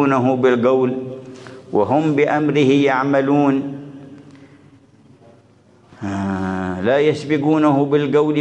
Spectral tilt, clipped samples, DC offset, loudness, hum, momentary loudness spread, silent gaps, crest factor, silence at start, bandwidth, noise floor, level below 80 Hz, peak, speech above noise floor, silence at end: -7.5 dB/octave; under 0.1%; under 0.1%; -17 LUFS; none; 16 LU; none; 14 dB; 0 s; 8.8 kHz; -51 dBFS; -66 dBFS; -4 dBFS; 35 dB; 0 s